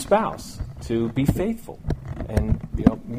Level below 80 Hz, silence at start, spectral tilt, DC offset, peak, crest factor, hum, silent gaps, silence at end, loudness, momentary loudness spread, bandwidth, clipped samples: -32 dBFS; 0 s; -7.5 dB/octave; under 0.1%; -2 dBFS; 22 dB; none; none; 0 s; -25 LUFS; 11 LU; 15.5 kHz; under 0.1%